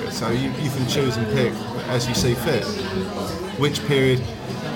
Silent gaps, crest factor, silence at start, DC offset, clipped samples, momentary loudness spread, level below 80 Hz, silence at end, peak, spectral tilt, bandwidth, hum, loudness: none; 16 dB; 0 s; under 0.1%; under 0.1%; 8 LU; -44 dBFS; 0 s; -6 dBFS; -5 dB/octave; 19 kHz; none; -22 LUFS